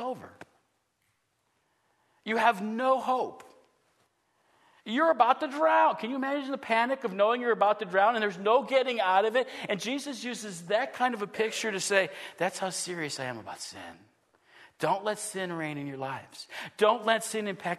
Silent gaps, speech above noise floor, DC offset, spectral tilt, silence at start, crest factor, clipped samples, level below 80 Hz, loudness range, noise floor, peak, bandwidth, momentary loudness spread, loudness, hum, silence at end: none; 47 dB; under 0.1%; -3.5 dB/octave; 0 s; 22 dB; under 0.1%; -82 dBFS; 8 LU; -75 dBFS; -8 dBFS; 13.5 kHz; 13 LU; -28 LUFS; none; 0 s